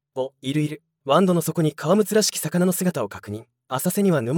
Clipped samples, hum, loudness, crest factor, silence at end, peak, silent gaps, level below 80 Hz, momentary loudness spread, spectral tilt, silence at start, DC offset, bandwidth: under 0.1%; none; -22 LUFS; 18 dB; 0 s; -4 dBFS; none; -68 dBFS; 13 LU; -5 dB/octave; 0.15 s; under 0.1%; 18 kHz